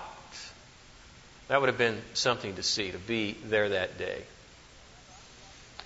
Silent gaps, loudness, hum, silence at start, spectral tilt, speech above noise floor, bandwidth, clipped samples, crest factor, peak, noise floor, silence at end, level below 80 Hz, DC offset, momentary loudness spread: none; -30 LUFS; none; 0 s; -3 dB/octave; 23 dB; 8 kHz; under 0.1%; 24 dB; -8 dBFS; -53 dBFS; 0 s; -60 dBFS; under 0.1%; 23 LU